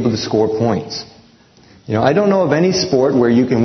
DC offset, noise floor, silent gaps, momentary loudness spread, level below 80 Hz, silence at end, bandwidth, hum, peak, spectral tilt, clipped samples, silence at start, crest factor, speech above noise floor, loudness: under 0.1%; -47 dBFS; none; 9 LU; -52 dBFS; 0 s; 6.4 kHz; none; 0 dBFS; -6 dB/octave; under 0.1%; 0 s; 16 dB; 33 dB; -15 LUFS